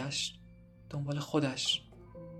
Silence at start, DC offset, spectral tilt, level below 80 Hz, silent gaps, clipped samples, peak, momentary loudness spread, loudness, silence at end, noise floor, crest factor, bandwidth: 0 s; under 0.1%; -4 dB/octave; -62 dBFS; none; under 0.1%; -16 dBFS; 21 LU; -34 LUFS; 0 s; -56 dBFS; 20 dB; 13 kHz